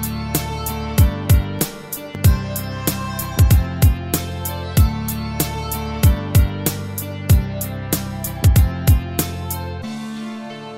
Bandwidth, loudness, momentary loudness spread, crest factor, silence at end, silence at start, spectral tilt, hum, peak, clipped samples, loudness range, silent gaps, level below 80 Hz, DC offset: 16.5 kHz; -20 LUFS; 11 LU; 16 dB; 0 s; 0 s; -5.5 dB/octave; none; -2 dBFS; under 0.1%; 2 LU; none; -24 dBFS; 0.2%